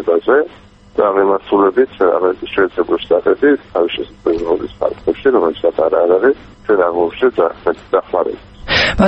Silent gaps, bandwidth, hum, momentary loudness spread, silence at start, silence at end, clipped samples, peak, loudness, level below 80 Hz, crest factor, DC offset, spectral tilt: none; 8.2 kHz; none; 6 LU; 0 s; 0 s; under 0.1%; 0 dBFS; -15 LUFS; -40 dBFS; 14 dB; under 0.1%; -6 dB/octave